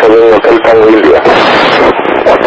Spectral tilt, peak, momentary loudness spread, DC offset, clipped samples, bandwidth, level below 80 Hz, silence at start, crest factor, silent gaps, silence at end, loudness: -5.5 dB/octave; 0 dBFS; 3 LU; under 0.1%; 9%; 8 kHz; -36 dBFS; 0 s; 4 dB; none; 0 s; -5 LUFS